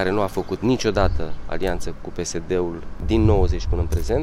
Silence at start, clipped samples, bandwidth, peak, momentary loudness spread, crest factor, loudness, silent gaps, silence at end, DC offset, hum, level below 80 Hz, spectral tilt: 0 s; under 0.1%; 14.5 kHz; -4 dBFS; 12 LU; 16 dB; -23 LUFS; none; 0 s; under 0.1%; none; -28 dBFS; -6 dB/octave